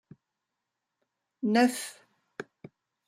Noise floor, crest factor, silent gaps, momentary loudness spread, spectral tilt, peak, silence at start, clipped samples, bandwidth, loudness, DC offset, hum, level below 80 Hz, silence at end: -86 dBFS; 22 dB; none; 22 LU; -4 dB/octave; -12 dBFS; 1.4 s; under 0.1%; 15.5 kHz; -27 LUFS; under 0.1%; none; -80 dBFS; 0.65 s